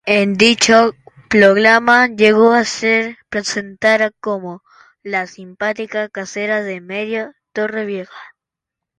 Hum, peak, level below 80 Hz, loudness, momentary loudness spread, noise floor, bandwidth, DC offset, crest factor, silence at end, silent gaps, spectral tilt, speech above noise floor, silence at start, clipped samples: none; 0 dBFS; -56 dBFS; -15 LUFS; 15 LU; -83 dBFS; 11 kHz; under 0.1%; 16 dB; 0.7 s; none; -3.5 dB/octave; 68 dB; 0.05 s; under 0.1%